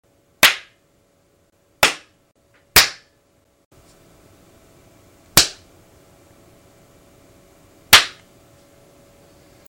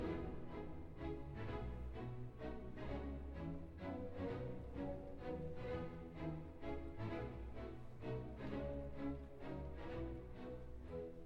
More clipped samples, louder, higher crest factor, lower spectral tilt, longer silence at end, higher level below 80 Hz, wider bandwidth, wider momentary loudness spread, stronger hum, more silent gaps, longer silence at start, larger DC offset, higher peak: neither; first, -15 LUFS vs -49 LUFS; first, 24 dB vs 16 dB; second, 0 dB/octave vs -9 dB/octave; first, 1.6 s vs 0 s; first, -48 dBFS vs -54 dBFS; first, 16.5 kHz vs 7.4 kHz; first, 14 LU vs 5 LU; neither; first, 3.65-3.71 s vs none; first, 0.4 s vs 0 s; neither; first, 0 dBFS vs -32 dBFS